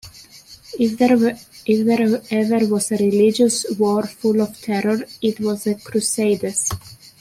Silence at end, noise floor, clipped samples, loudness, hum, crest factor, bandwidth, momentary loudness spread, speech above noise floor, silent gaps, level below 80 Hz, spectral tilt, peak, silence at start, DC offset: 0.25 s; -44 dBFS; under 0.1%; -19 LUFS; none; 16 dB; 16 kHz; 7 LU; 26 dB; none; -56 dBFS; -4.5 dB/octave; -4 dBFS; 0.05 s; under 0.1%